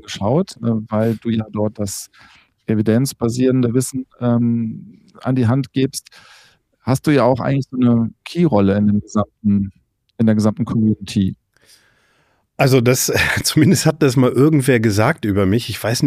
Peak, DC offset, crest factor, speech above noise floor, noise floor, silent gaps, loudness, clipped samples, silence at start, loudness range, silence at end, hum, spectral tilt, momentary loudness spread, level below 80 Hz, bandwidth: -2 dBFS; under 0.1%; 14 dB; 44 dB; -61 dBFS; none; -17 LUFS; under 0.1%; 0.1 s; 5 LU; 0 s; none; -6 dB/octave; 9 LU; -48 dBFS; 15.5 kHz